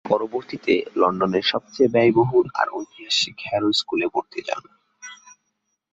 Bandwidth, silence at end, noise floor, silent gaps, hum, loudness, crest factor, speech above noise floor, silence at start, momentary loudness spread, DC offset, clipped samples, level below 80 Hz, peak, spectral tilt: 8 kHz; 0.8 s; -75 dBFS; none; none; -21 LUFS; 18 dB; 54 dB; 0.05 s; 15 LU; under 0.1%; under 0.1%; -62 dBFS; -4 dBFS; -4.5 dB/octave